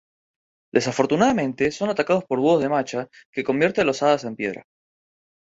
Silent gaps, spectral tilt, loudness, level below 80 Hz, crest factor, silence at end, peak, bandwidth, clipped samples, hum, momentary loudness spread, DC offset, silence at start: 3.25-3.33 s; -5.5 dB/octave; -22 LUFS; -60 dBFS; 20 dB; 0.95 s; -4 dBFS; 8 kHz; under 0.1%; none; 10 LU; under 0.1%; 0.75 s